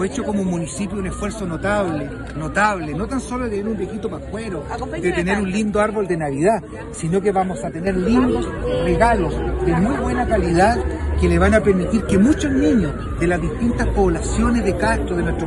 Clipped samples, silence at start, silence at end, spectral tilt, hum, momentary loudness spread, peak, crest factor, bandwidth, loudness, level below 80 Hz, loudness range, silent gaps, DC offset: under 0.1%; 0 s; 0 s; -6.5 dB/octave; none; 9 LU; -2 dBFS; 16 dB; 12 kHz; -20 LUFS; -28 dBFS; 5 LU; none; under 0.1%